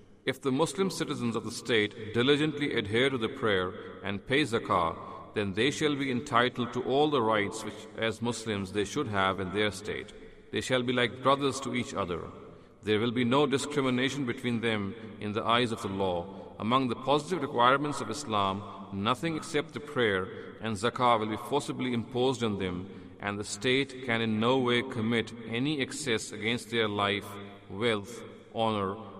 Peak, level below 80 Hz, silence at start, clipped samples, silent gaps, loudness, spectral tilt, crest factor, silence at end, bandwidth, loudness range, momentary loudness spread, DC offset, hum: -10 dBFS; -62 dBFS; 0.1 s; under 0.1%; none; -30 LUFS; -5 dB/octave; 20 dB; 0 s; 15 kHz; 2 LU; 11 LU; under 0.1%; none